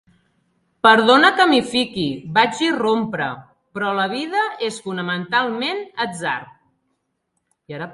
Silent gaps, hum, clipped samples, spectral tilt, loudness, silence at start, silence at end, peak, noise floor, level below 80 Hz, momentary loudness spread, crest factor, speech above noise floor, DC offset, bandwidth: none; none; under 0.1%; -4 dB/octave; -18 LUFS; 0.85 s; 0 s; 0 dBFS; -73 dBFS; -62 dBFS; 14 LU; 20 dB; 54 dB; under 0.1%; 11.5 kHz